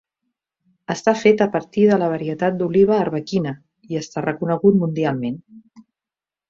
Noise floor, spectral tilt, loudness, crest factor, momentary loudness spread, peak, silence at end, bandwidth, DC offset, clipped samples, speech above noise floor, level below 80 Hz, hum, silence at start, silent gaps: -90 dBFS; -7 dB/octave; -19 LUFS; 18 dB; 13 LU; -2 dBFS; 0.9 s; 7.6 kHz; under 0.1%; under 0.1%; 71 dB; -60 dBFS; none; 0.9 s; none